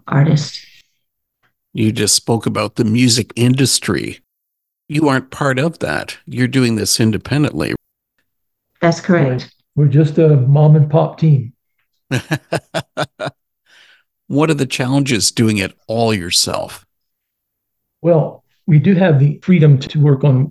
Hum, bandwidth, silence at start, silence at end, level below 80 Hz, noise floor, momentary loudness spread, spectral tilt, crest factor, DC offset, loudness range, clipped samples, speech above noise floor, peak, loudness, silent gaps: none; 12.5 kHz; 0.05 s; 0 s; -48 dBFS; -76 dBFS; 13 LU; -5.5 dB/octave; 16 dB; under 0.1%; 5 LU; under 0.1%; 62 dB; 0 dBFS; -15 LUFS; none